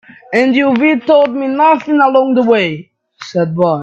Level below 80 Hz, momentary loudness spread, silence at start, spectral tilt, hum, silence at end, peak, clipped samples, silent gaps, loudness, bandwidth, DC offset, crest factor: -58 dBFS; 8 LU; 0.3 s; -7 dB/octave; none; 0 s; 0 dBFS; under 0.1%; none; -12 LUFS; 8.2 kHz; under 0.1%; 12 dB